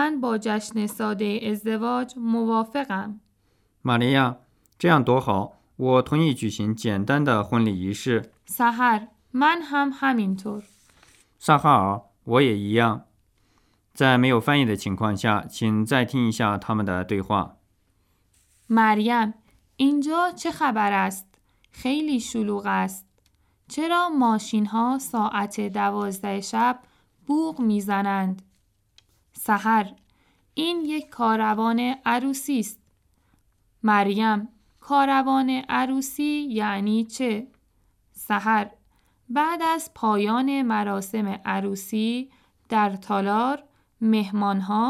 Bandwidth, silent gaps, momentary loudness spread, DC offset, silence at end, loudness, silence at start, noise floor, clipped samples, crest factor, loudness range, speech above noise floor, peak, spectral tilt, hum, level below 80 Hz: 15.5 kHz; none; 9 LU; under 0.1%; 0 s; -23 LUFS; 0 s; -66 dBFS; under 0.1%; 20 dB; 4 LU; 43 dB; -4 dBFS; -5.5 dB/octave; none; -64 dBFS